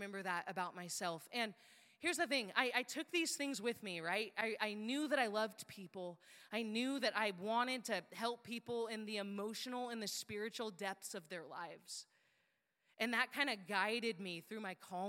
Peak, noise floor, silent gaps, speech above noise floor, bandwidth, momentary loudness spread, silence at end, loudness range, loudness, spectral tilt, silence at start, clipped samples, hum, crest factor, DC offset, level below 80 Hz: -18 dBFS; -82 dBFS; none; 40 dB; 16.5 kHz; 12 LU; 0 s; 6 LU; -41 LUFS; -2.5 dB/octave; 0 s; under 0.1%; none; 24 dB; under 0.1%; under -90 dBFS